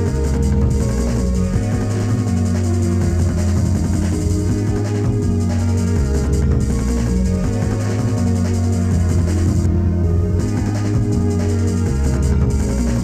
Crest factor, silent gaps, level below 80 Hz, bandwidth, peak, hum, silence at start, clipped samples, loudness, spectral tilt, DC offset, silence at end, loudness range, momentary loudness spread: 12 dB; none; -22 dBFS; 13.5 kHz; -4 dBFS; none; 0 s; under 0.1%; -18 LUFS; -7.5 dB/octave; under 0.1%; 0 s; 1 LU; 2 LU